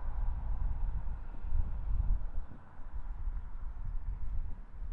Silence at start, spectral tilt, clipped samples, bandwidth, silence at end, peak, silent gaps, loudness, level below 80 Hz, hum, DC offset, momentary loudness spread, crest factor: 0 s; -9.5 dB/octave; under 0.1%; 2.3 kHz; 0 s; -18 dBFS; none; -42 LUFS; -36 dBFS; none; under 0.1%; 10 LU; 14 dB